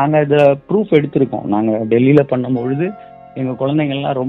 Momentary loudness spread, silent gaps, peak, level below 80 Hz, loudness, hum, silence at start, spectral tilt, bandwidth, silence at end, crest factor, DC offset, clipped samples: 10 LU; none; 0 dBFS; -54 dBFS; -15 LUFS; none; 0 s; -9.5 dB/octave; 4.9 kHz; 0 s; 14 dB; under 0.1%; under 0.1%